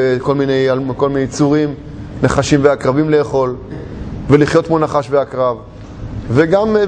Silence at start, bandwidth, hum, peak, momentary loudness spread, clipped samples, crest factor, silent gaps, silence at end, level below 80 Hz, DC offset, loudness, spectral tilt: 0 s; 9.8 kHz; none; 0 dBFS; 15 LU; under 0.1%; 14 dB; none; 0 s; -36 dBFS; under 0.1%; -14 LUFS; -6.5 dB/octave